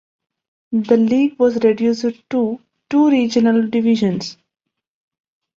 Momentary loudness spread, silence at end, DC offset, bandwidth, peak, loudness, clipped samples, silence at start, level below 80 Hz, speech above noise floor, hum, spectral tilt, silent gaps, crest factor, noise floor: 9 LU; 1.25 s; under 0.1%; 7.6 kHz; -2 dBFS; -17 LUFS; under 0.1%; 0.7 s; -62 dBFS; 64 dB; none; -6.5 dB/octave; none; 16 dB; -79 dBFS